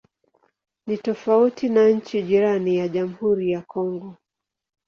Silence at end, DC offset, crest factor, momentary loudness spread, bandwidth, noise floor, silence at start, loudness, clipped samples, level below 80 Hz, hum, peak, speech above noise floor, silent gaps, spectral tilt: 0.75 s; under 0.1%; 16 dB; 11 LU; 6.8 kHz; -66 dBFS; 0.85 s; -21 LUFS; under 0.1%; -66 dBFS; none; -6 dBFS; 45 dB; none; -7.5 dB/octave